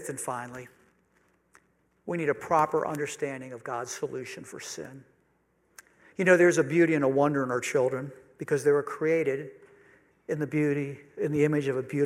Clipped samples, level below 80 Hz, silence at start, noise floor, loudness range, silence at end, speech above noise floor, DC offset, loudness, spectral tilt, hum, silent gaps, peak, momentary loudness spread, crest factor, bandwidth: under 0.1%; -74 dBFS; 0 s; -69 dBFS; 7 LU; 0 s; 42 dB; under 0.1%; -27 LUFS; -6 dB/octave; none; none; -8 dBFS; 17 LU; 22 dB; 15.5 kHz